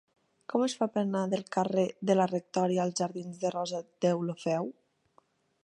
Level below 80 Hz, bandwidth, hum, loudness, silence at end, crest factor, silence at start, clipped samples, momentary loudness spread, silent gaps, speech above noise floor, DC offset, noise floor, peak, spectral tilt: -78 dBFS; 11 kHz; none; -31 LUFS; 0.9 s; 20 dB; 0.5 s; under 0.1%; 7 LU; none; 38 dB; under 0.1%; -68 dBFS; -12 dBFS; -6 dB/octave